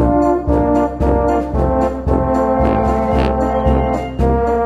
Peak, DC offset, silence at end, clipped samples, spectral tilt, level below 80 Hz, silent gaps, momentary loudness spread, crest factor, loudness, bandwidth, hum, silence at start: -2 dBFS; under 0.1%; 0 s; under 0.1%; -9 dB/octave; -22 dBFS; none; 2 LU; 12 dB; -16 LUFS; 7.8 kHz; none; 0 s